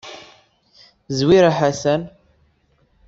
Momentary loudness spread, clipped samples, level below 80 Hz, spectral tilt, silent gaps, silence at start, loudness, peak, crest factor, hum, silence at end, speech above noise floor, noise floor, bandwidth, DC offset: 24 LU; under 0.1%; -50 dBFS; -6 dB/octave; none; 0.05 s; -17 LUFS; -2 dBFS; 18 dB; none; 1 s; 45 dB; -61 dBFS; 7.8 kHz; under 0.1%